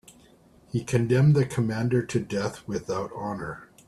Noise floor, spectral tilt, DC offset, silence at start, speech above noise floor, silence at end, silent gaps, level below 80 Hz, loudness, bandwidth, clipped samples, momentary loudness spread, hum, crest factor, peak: -56 dBFS; -7 dB/octave; under 0.1%; 0.75 s; 31 dB; 0.25 s; none; -56 dBFS; -26 LUFS; 12.5 kHz; under 0.1%; 12 LU; none; 16 dB; -10 dBFS